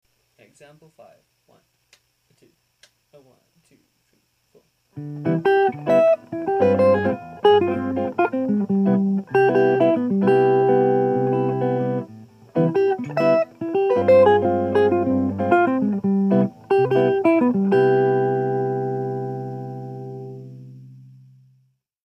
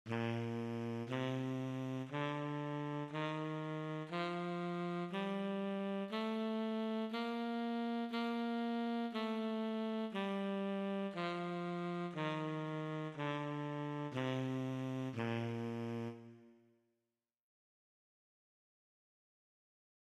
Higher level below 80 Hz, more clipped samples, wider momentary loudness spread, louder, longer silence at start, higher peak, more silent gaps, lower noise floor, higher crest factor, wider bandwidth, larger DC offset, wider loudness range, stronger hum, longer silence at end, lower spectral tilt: first, -68 dBFS vs -86 dBFS; neither; first, 12 LU vs 3 LU; first, -19 LUFS vs -41 LUFS; first, 4.95 s vs 0.05 s; first, -4 dBFS vs -26 dBFS; neither; second, -66 dBFS vs under -90 dBFS; about the same, 16 dB vs 16 dB; second, 6.2 kHz vs 12 kHz; neither; first, 7 LU vs 4 LU; neither; second, 1.15 s vs 3.5 s; first, -9 dB/octave vs -7.5 dB/octave